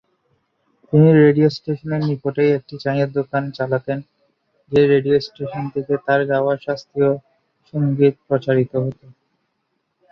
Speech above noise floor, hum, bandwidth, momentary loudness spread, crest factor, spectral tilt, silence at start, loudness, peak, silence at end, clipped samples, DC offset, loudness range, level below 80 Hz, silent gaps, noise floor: 54 dB; none; 6.4 kHz; 12 LU; 16 dB; -9 dB/octave; 0.9 s; -18 LUFS; -2 dBFS; 1.2 s; under 0.1%; under 0.1%; 4 LU; -58 dBFS; none; -71 dBFS